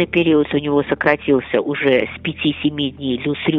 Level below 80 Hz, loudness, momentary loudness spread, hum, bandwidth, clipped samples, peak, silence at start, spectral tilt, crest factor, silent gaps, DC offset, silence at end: -46 dBFS; -18 LUFS; 6 LU; none; 5.2 kHz; under 0.1%; 0 dBFS; 0 s; -8.5 dB/octave; 16 dB; none; under 0.1%; 0 s